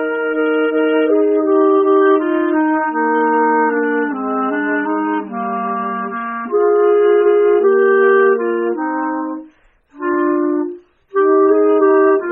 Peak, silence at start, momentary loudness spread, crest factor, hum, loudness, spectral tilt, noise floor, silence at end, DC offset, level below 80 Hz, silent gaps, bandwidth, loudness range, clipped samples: -2 dBFS; 0 s; 9 LU; 12 dB; none; -15 LUFS; 1 dB/octave; -49 dBFS; 0 s; under 0.1%; -62 dBFS; none; 3.4 kHz; 4 LU; under 0.1%